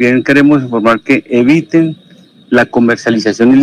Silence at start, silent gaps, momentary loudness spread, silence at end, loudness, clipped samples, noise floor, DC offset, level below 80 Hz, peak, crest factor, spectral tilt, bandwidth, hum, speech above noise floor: 0 s; none; 4 LU; 0 s; -10 LUFS; under 0.1%; -38 dBFS; under 0.1%; -52 dBFS; -2 dBFS; 8 dB; -6.5 dB/octave; 10 kHz; none; 29 dB